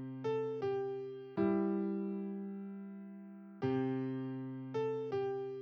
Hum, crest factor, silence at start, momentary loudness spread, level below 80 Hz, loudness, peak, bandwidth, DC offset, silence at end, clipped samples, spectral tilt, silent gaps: none; 16 dB; 0 s; 13 LU; -80 dBFS; -38 LUFS; -22 dBFS; 6.6 kHz; under 0.1%; 0 s; under 0.1%; -9.5 dB/octave; none